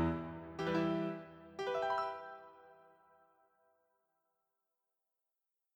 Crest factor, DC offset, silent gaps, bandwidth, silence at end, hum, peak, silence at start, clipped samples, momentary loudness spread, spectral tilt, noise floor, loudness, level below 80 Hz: 18 dB; under 0.1%; none; 19 kHz; 2.95 s; none; -24 dBFS; 0 s; under 0.1%; 17 LU; -7 dB/octave; -89 dBFS; -39 LUFS; -64 dBFS